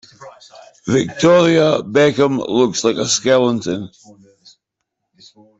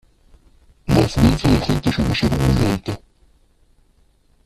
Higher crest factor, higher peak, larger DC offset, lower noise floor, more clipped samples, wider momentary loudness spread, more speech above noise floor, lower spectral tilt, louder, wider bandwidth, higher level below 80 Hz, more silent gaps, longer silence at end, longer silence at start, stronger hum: about the same, 14 dB vs 18 dB; about the same, -2 dBFS vs -2 dBFS; neither; first, -77 dBFS vs -57 dBFS; neither; about the same, 12 LU vs 13 LU; first, 61 dB vs 40 dB; second, -4.5 dB/octave vs -6.5 dB/octave; first, -15 LUFS vs -18 LUFS; second, 8.4 kHz vs 14 kHz; second, -54 dBFS vs -30 dBFS; neither; first, 1.7 s vs 1.5 s; second, 0.2 s vs 0.85 s; neither